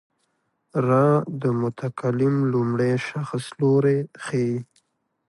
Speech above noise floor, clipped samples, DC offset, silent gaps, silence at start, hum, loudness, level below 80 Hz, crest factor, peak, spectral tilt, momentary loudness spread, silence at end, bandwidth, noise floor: 50 dB; under 0.1%; under 0.1%; none; 0.75 s; none; -23 LUFS; -64 dBFS; 16 dB; -8 dBFS; -8 dB/octave; 9 LU; 0.65 s; 11.5 kHz; -72 dBFS